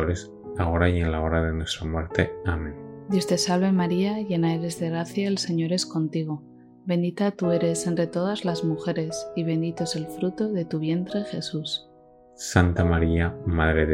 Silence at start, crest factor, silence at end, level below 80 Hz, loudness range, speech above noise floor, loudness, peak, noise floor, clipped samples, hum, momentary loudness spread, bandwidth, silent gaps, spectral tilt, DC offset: 0 s; 22 dB; 0 s; -38 dBFS; 3 LU; 28 dB; -25 LUFS; -2 dBFS; -53 dBFS; under 0.1%; none; 8 LU; 15.5 kHz; none; -5.5 dB/octave; under 0.1%